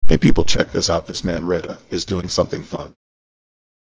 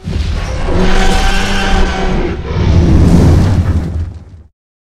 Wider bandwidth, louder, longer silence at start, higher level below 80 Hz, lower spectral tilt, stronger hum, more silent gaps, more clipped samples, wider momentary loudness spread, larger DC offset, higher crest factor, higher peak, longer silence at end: second, 8 kHz vs 12 kHz; second, -20 LUFS vs -12 LUFS; about the same, 0 s vs 0 s; second, -30 dBFS vs -14 dBFS; about the same, -5 dB/octave vs -6 dB/octave; neither; neither; second, under 0.1% vs 0.4%; first, 13 LU vs 10 LU; neither; first, 16 dB vs 10 dB; about the same, 0 dBFS vs 0 dBFS; first, 1.1 s vs 0.5 s